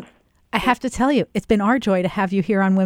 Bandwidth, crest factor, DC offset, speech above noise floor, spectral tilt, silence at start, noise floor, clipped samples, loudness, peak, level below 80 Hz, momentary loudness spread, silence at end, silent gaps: 13.5 kHz; 16 dB; under 0.1%; 33 dB; -6.5 dB/octave; 0 s; -52 dBFS; under 0.1%; -20 LUFS; -2 dBFS; -44 dBFS; 3 LU; 0 s; none